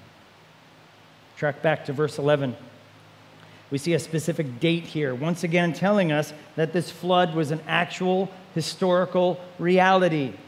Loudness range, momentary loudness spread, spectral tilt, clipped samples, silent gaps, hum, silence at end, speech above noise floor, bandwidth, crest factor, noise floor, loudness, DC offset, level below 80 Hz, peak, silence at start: 5 LU; 8 LU; -6 dB/octave; under 0.1%; none; none; 0 s; 29 dB; 15 kHz; 20 dB; -52 dBFS; -24 LUFS; under 0.1%; -74 dBFS; -4 dBFS; 1.35 s